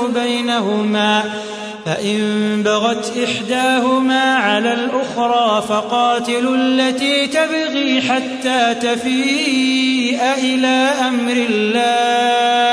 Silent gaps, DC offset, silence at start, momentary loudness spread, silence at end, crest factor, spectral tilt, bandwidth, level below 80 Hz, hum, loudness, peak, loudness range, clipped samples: none; under 0.1%; 0 s; 4 LU; 0 s; 14 dB; -3.5 dB/octave; 11 kHz; -64 dBFS; none; -16 LUFS; -2 dBFS; 2 LU; under 0.1%